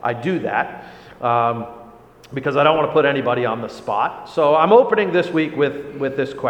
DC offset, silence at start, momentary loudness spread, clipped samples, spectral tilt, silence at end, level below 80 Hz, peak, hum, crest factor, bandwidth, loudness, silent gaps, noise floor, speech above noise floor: under 0.1%; 0 s; 13 LU; under 0.1%; -7 dB/octave; 0 s; -58 dBFS; 0 dBFS; none; 18 dB; 8.8 kHz; -18 LUFS; none; -43 dBFS; 25 dB